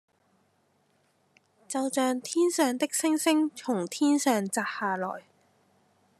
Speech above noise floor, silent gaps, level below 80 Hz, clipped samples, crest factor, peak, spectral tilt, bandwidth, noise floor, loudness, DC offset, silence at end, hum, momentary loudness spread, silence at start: 42 dB; none; -90 dBFS; under 0.1%; 18 dB; -10 dBFS; -3.5 dB/octave; 13.5 kHz; -69 dBFS; -27 LUFS; under 0.1%; 1 s; none; 8 LU; 1.7 s